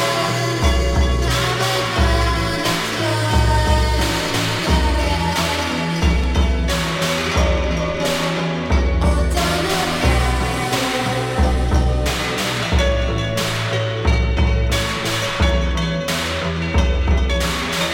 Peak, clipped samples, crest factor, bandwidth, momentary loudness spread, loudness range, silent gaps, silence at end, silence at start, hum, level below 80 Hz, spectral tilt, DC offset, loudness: -2 dBFS; under 0.1%; 14 dB; 17 kHz; 3 LU; 1 LU; none; 0 s; 0 s; none; -22 dBFS; -4.5 dB/octave; under 0.1%; -19 LUFS